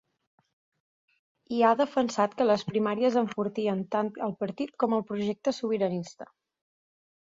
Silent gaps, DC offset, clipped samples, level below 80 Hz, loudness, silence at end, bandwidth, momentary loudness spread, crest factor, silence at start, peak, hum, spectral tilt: none; under 0.1%; under 0.1%; -72 dBFS; -28 LUFS; 1 s; 7.8 kHz; 9 LU; 18 dB; 1.5 s; -10 dBFS; none; -6 dB/octave